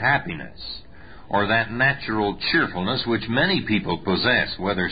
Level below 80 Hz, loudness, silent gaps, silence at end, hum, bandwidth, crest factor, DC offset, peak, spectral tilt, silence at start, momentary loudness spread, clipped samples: -46 dBFS; -22 LUFS; none; 0 s; none; 5 kHz; 16 dB; 0.8%; -8 dBFS; -10 dB/octave; 0 s; 14 LU; under 0.1%